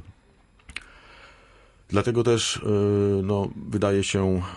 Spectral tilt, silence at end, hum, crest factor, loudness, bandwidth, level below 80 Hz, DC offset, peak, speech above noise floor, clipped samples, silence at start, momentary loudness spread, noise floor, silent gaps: -5.5 dB/octave; 0 s; none; 16 dB; -24 LUFS; 11.5 kHz; -44 dBFS; under 0.1%; -10 dBFS; 35 dB; under 0.1%; 0.05 s; 18 LU; -58 dBFS; none